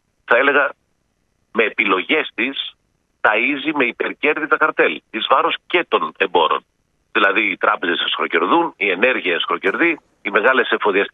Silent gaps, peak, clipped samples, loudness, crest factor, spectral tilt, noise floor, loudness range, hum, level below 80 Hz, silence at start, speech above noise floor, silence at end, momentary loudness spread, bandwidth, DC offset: none; 0 dBFS; under 0.1%; -17 LUFS; 18 dB; -5.5 dB/octave; -66 dBFS; 2 LU; none; -68 dBFS; 0.3 s; 49 dB; 0.05 s; 6 LU; 4.9 kHz; under 0.1%